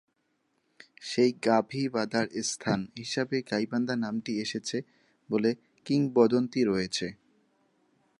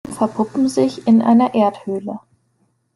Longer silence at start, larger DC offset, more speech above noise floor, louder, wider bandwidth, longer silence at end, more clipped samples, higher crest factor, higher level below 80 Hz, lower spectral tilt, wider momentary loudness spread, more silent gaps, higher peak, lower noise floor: first, 1 s vs 0.05 s; neither; about the same, 47 dB vs 48 dB; second, -29 LUFS vs -17 LUFS; about the same, 11.5 kHz vs 12 kHz; first, 1.05 s vs 0.8 s; neither; first, 22 dB vs 14 dB; second, -68 dBFS vs -60 dBFS; second, -5 dB/octave vs -6.5 dB/octave; second, 10 LU vs 13 LU; neither; second, -8 dBFS vs -2 dBFS; first, -75 dBFS vs -64 dBFS